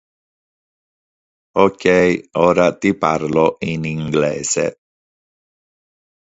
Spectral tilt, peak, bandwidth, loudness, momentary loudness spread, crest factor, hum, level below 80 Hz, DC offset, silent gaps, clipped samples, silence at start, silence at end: -5 dB/octave; 0 dBFS; 8 kHz; -17 LUFS; 8 LU; 18 dB; none; -50 dBFS; under 0.1%; none; under 0.1%; 1.55 s; 1.7 s